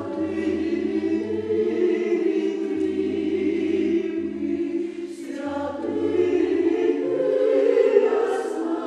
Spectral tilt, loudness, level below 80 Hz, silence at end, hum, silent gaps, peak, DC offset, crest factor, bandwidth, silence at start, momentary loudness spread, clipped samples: -6.5 dB/octave; -23 LUFS; -60 dBFS; 0 s; none; none; -4 dBFS; under 0.1%; 18 dB; 10.5 kHz; 0 s; 9 LU; under 0.1%